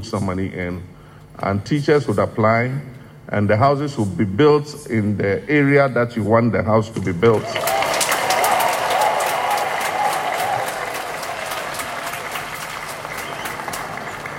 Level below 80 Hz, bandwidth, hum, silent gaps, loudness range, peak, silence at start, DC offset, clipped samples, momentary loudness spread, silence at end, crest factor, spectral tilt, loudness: -52 dBFS; 16.5 kHz; none; none; 7 LU; -4 dBFS; 0 s; under 0.1%; under 0.1%; 11 LU; 0 s; 16 dB; -5 dB/octave; -19 LUFS